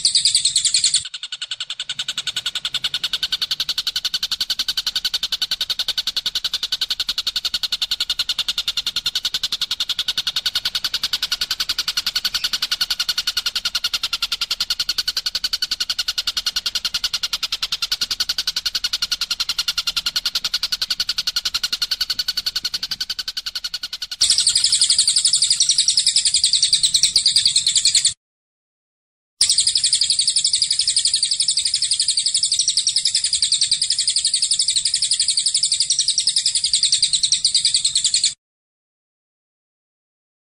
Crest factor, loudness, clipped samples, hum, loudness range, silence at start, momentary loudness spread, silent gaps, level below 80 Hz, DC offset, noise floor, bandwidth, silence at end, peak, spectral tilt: 18 dB; -17 LUFS; under 0.1%; none; 6 LU; 0 s; 8 LU; 28.17-29.37 s; -52 dBFS; under 0.1%; under -90 dBFS; 16 kHz; 2.2 s; -2 dBFS; 3 dB/octave